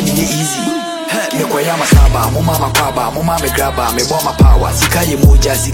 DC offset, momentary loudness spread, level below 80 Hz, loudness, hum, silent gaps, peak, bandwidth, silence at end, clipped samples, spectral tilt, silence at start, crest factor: under 0.1%; 7 LU; -16 dBFS; -12 LUFS; none; none; 0 dBFS; 17 kHz; 0 s; 0.4%; -4.5 dB/octave; 0 s; 12 dB